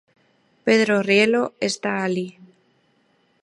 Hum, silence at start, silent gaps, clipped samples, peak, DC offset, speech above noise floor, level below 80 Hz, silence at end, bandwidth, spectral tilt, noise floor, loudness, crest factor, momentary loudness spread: none; 0.65 s; none; under 0.1%; -4 dBFS; under 0.1%; 44 dB; -72 dBFS; 1.1 s; 11.5 kHz; -4.5 dB/octave; -63 dBFS; -20 LUFS; 20 dB; 11 LU